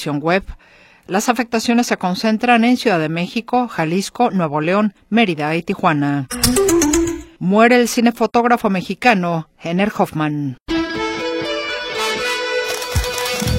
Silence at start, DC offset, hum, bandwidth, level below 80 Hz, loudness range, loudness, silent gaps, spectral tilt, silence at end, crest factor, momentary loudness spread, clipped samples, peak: 0 s; under 0.1%; none; 16.5 kHz; -38 dBFS; 5 LU; -17 LUFS; 10.62-10.66 s; -4.5 dB/octave; 0 s; 18 dB; 8 LU; under 0.1%; 0 dBFS